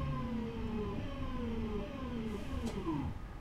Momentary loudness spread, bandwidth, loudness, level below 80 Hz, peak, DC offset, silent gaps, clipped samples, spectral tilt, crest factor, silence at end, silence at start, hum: 3 LU; 14 kHz; -40 LUFS; -44 dBFS; -26 dBFS; under 0.1%; none; under 0.1%; -7.5 dB/octave; 12 dB; 0 s; 0 s; none